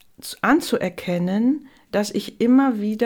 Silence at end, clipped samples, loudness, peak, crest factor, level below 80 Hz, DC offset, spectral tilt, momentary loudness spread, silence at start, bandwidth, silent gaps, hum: 0 s; under 0.1%; -21 LUFS; -6 dBFS; 16 dB; -58 dBFS; under 0.1%; -5.5 dB/octave; 9 LU; 0.25 s; 18 kHz; none; none